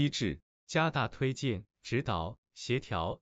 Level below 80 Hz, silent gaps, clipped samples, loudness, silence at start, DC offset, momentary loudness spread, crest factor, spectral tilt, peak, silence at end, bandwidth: -54 dBFS; 0.42-0.67 s, 2.38-2.43 s; under 0.1%; -34 LUFS; 0 s; under 0.1%; 10 LU; 18 dB; -5.5 dB/octave; -16 dBFS; 0.05 s; 8.2 kHz